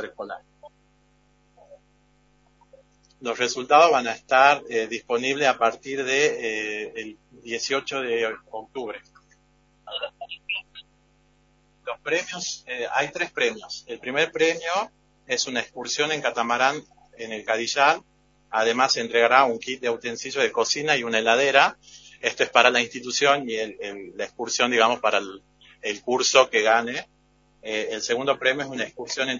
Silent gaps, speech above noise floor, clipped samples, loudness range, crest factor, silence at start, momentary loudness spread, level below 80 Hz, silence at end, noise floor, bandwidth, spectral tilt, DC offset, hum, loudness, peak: none; 38 dB; under 0.1%; 10 LU; 24 dB; 0 s; 17 LU; -66 dBFS; 0 s; -62 dBFS; 7.6 kHz; -1.5 dB/octave; under 0.1%; 50 Hz at -65 dBFS; -23 LUFS; 0 dBFS